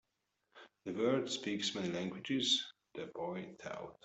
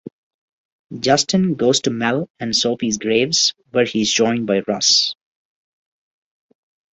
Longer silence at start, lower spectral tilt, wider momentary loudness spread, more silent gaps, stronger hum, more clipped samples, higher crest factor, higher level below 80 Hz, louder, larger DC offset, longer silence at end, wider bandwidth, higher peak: second, 0.55 s vs 0.9 s; about the same, -3.5 dB/octave vs -3 dB/octave; first, 15 LU vs 8 LU; second, none vs 2.30-2.35 s; neither; neither; about the same, 20 dB vs 18 dB; second, -78 dBFS vs -58 dBFS; second, -37 LUFS vs -17 LUFS; neither; second, 0.1 s vs 1.8 s; about the same, 8.2 kHz vs 8.2 kHz; second, -20 dBFS vs -2 dBFS